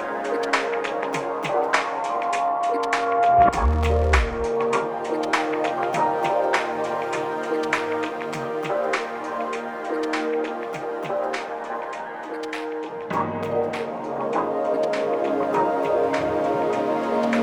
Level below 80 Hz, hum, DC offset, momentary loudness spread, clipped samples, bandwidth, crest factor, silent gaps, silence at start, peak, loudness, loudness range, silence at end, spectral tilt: -36 dBFS; none; under 0.1%; 8 LU; under 0.1%; 17.5 kHz; 20 dB; none; 0 s; -4 dBFS; -24 LUFS; 7 LU; 0 s; -5.5 dB/octave